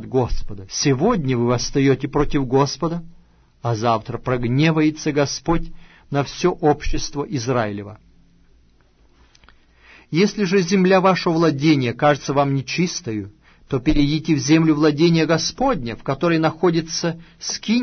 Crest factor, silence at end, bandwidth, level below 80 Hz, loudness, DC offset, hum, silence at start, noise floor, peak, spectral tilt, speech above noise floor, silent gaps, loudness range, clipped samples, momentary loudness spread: 16 dB; 0 s; 6.6 kHz; -34 dBFS; -19 LUFS; under 0.1%; none; 0 s; -54 dBFS; -2 dBFS; -5.5 dB/octave; 36 dB; none; 6 LU; under 0.1%; 11 LU